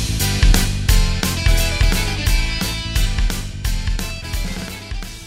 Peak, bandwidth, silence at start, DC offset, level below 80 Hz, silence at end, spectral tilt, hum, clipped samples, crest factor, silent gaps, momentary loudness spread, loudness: 0 dBFS; 16.5 kHz; 0 s; under 0.1%; -18 dBFS; 0 s; -3.5 dB/octave; none; under 0.1%; 16 dB; none; 9 LU; -20 LUFS